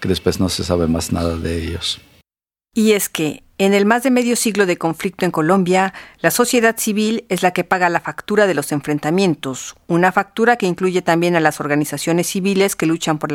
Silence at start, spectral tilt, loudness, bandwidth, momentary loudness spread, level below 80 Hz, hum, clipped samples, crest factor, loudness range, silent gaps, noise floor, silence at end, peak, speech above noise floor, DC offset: 0 s; -4.5 dB/octave; -17 LUFS; 17.5 kHz; 7 LU; -42 dBFS; none; under 0.1%; 18 dB; 2 LU; none; under -90 dBFS; 0 s; 0 dBFS; over 73 dB; under 0.1%